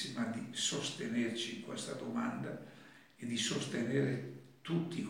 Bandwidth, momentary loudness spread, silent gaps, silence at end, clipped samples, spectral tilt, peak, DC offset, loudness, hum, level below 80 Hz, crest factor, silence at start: 16.5 kHz; 13 LU; none; 0 s; under 0.1%; -4 dB/octave; -22 dBFS; under 0.1%; -38 LUFS; none; -84 dBFS; 18 dB; 0 s